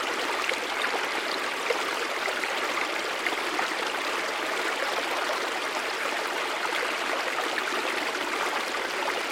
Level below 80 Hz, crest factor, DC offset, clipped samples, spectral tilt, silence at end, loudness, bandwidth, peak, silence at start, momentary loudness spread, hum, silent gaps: -70 dBFS; 18 dB; under 0.1%; under 0.1%; -0.5 dB/octave; 0 s; -27 LUFS; 16.5 kHz; -10 dBFS; 0 s; 1 LU; none; none